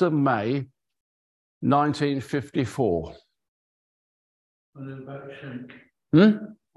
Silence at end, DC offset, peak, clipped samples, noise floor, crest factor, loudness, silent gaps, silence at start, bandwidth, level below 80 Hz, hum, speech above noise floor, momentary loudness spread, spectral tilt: 0.25 s; under 0.1%; -4 dBFS; under 0.1%; under -90 dBFS; 22 dB; -23 LUFS; 1.00-1.61 s, 3.48-4.73 s; 0 s; 12 kHz; -56 dBFS; none; over 66 dB; 22 LU; -7.5 dB/octave